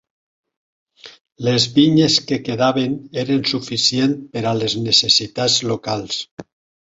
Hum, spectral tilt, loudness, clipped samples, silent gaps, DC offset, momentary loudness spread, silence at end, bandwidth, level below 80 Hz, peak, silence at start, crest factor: none; -4 dB/octave; -17 LUFS; under 0.1%; 1.21-1.25 s, 6.31-6.37 s; under 0.1%; 10 LU; 0.5 s; 8 kHz; -56 dBFS; -2 dBFS; 1.05 s; 18 dB